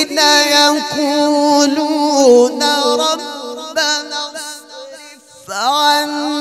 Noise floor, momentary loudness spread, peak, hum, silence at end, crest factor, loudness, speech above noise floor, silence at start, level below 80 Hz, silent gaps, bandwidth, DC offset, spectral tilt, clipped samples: -39 dBFS; 17 LU; 0 dBFS; none; 0 s; 14 dB; -13 LUFS; 27 dB; 0 s; -68 dBFS; none; 15.5 kHz; under 0.1%; -1 dB/octave; under 0.1%